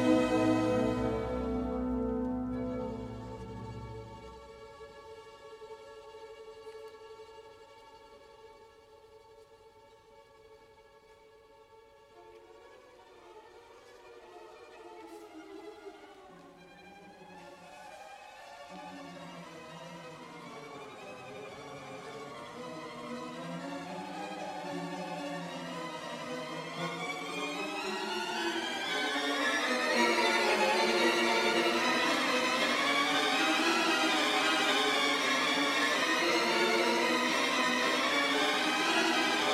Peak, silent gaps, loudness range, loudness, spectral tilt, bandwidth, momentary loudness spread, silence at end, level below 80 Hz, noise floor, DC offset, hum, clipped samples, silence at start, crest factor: -16 dBFS; none; 23 LU; -30 LUFS; -3 dB/octave; 16 kHz; 23 LU; 0 s; -58 dBFS; -59 dBFS; under 0.1%; none; under 0.1%; 0 s; 18 dB